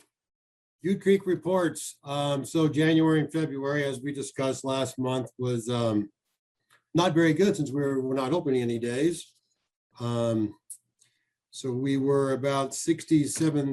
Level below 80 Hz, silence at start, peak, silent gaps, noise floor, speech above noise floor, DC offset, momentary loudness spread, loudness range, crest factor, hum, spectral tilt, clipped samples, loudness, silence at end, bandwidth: -68 dBFS; 0.85 s; -10 dBFS; 6.39-6.55 s, 9.76-9.90 s; -72 dBFS; 46 dB; under 0.1%; 11 LU; 5 LU; 18 dB; none; -5.5 dB/octave; under 0.1%; -27 LUFS; 0 s; 12.5 kHz